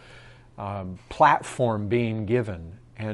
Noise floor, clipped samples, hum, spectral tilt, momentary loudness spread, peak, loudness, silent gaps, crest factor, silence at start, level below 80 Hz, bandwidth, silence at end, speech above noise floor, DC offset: -48 dBFS; under 0.1%; none; -6.5 dB/octave; 18 LU; -4 dBFS; -24 LUFS; none; 22 dB; 0.05 s; -54 dBFS; 11.5 kHz; 0 s; 24 dB; under 0.1%